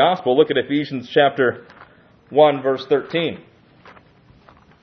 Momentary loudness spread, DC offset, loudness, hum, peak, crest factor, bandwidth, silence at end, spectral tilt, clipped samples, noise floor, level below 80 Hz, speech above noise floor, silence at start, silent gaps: 8 LU; under 0.1%; -18 LUFS; none; -2 dBFS; 18 dB; 6.2 kHz; 1.4 s; -7.5 dB/octave; under 0.1%; -51 dBFS; -64 dBFS; 33 dB; 0 s; none